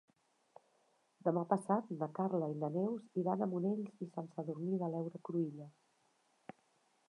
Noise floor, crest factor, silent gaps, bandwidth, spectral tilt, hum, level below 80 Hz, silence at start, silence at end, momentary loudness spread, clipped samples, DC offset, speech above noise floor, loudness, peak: -76 dBFS; 22 dB; none; 11 kHz; -9.5 dB/octave; none; under -90 dBFS; 1.25 s; 1.4 s; 17 LU; under 0.1%; under 0.1%; 38 dB; -39 LUFS; -18 dBFS